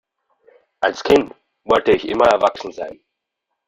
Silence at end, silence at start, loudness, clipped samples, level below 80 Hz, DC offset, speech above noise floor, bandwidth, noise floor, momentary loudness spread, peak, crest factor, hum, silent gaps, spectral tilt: 0.75 s; 0.8 s; -17 LUFS; under 0.1%; -50 dBFS; under 0.1%; 62 dB; 14 kHz; -78 dBFS; 16 LU; 0 dBFS; 18 dB; none; none; -4.5 dB/octave